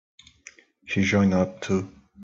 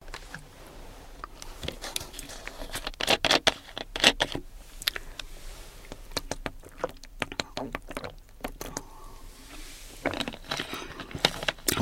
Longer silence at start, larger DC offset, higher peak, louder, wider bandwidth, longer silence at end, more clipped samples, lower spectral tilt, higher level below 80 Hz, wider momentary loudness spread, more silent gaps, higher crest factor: first, 0.85 s vs 0 s; neither; second, -10 dBFS vs 0 dBFS; first, -24 LUFS vs -30 LUFS; second, 7.6 kHz vs 16.5 kHz; about the same, 0 s vs 0 s; neither; first, -6 dB/octave vs -2 dB/octave; second, -60 dBFS vs -46 dBFS; second, 9 LU vs 24 LU; neither; second, 16 dB vs 32 dB